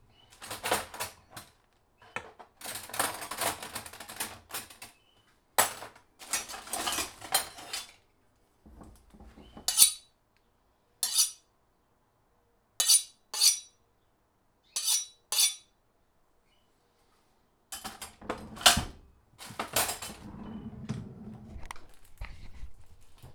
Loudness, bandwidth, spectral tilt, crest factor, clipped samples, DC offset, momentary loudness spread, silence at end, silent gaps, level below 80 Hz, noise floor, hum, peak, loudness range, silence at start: -28 LUFS; over 20 kHz; 0 dB/octave; 30 dB; under 0.1%; under 0.1%; 25 LU; 0 s; none; -56 dBFS; -71 dBFS; none; -4 dBFS; 9 LU; 0.4 s